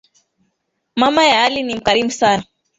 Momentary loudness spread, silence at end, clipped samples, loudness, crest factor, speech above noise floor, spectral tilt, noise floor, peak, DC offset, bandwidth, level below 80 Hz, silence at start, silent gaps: 8 LU; 0.35 s; under 0.1%; -15 LUFS; 16 dB; 56 dB; -3 dB/octave; -71 dBFS; 0 dBFS; under 0.1%; 8 kHz; -52 dBFS; 0.95 s; none